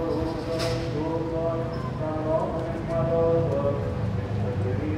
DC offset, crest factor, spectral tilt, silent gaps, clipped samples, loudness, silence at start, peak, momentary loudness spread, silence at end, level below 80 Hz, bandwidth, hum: under 0.1%; 14 dB; -7.5 dB/octave; none; under 0.1%; -27 LUFS; 0 s; -12 dBFS; 6 LU; 0 s; -42 dBFS; 13.5 kHz; none